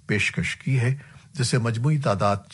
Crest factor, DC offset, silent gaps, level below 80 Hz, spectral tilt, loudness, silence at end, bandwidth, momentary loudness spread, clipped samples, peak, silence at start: 16 dB; under 0.1%; none; -54 dBFS; -5.5 dB/octave; -24 LUFS; 0 s; 11.5 kHz; 5 LU; under 0.1%; -8 dBFS; 0.1 s